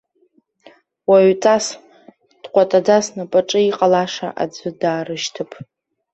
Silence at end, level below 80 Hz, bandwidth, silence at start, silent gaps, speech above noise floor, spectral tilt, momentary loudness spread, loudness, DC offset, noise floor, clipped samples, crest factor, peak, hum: 0.5 s; -64 dBFS; 8.4 kHz; 1.1 s; none; 44 dB; -4.5 dB/octave; 13 LU; -17 LUFS; under 0.1%; -60 dBFS; under 0.1%; 16 dB; -2 dBFS; none